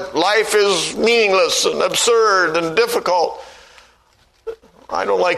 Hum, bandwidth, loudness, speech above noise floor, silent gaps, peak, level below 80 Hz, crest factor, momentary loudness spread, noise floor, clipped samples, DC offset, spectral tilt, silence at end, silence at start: none; 13.5 kHz; -15 LUFS; 40 dB; none; -2 dBFS; -56 dBFS; 16 dB; 20 LU; -56 dBFS; under 0.1%; under 0.1%; -1.5 dB/octave; 0 s; 0 s